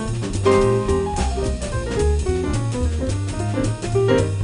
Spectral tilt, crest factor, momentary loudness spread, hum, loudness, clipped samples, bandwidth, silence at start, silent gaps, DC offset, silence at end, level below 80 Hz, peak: -6.5 dB/octave; 14 dB; 7 LU; none; -21 LUFS; under 0.1%; 10 kHz; 0 s; none; under 0.1%; 0 s; -26 dBFS; -4 dBFS